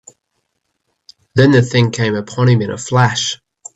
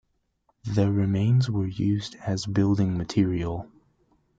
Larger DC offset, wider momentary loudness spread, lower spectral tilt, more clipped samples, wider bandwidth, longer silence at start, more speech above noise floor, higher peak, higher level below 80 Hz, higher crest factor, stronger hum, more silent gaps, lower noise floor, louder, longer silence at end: neither; about the same, 9 LU vs 8 LU; second, -5.5 dB/octave vs -7.5 dB/octave; neither; about the same, 8.2 kHz vs 7.8 kHz; first, 1.35 s vs 0.65 s; first, 57 dB vs 47 dB; first, 0 dBFS vs -10 dBFS; about the same, -52 dBFS vs -52 dBFS; about the same, 16 dB vs 16 dB; neither; neither; about the same, -70 dBFS vs -71 dBFS; first, -14 LUFS vs -25 LUFS; second, 0.4 s vs 0.75 s